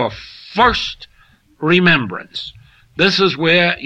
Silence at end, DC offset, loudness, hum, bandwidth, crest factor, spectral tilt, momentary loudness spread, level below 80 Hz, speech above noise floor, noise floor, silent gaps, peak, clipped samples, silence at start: 0 s; under 0.1%; -15 LUFS; none; 8.4 kHz; 16 dB; -5.5 dB/octave; 20 LU; -42 dBFS; 36 dB; -52 dBFS; none; -2 dBFS; under 0.1%; 0 s